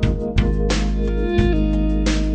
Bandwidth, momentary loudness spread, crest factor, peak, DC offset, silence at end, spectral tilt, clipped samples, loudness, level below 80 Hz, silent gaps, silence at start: 9 kHz; 2 LU; 14 dB; -4 dBFS; under 0.1%; 0 s; -6.5 dB/octave; under 0.1%; -20 LUFS; -20 dBFS; none; 0 s